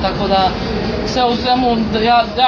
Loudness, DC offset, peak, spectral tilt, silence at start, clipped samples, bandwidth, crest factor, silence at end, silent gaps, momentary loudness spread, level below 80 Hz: -15 LUFS; under 0.1%; -2 dBFS; -5.5 dB/octave; 0 s; under 0.1%; 7.2 kHz; 14 dB; 0 s; none; 6 LU; -32 dBFS